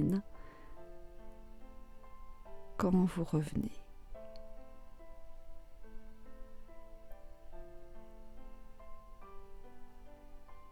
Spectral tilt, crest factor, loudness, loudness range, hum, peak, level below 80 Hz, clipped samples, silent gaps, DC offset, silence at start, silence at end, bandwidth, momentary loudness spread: -8 dB/octave; 22 dB; -35 LUFS; 20 LU; none; -20 dBFS; -52 dBFS; under 0.1%; none; under 0.1%; 0 s; 0 s; 14 kHz; 24 LU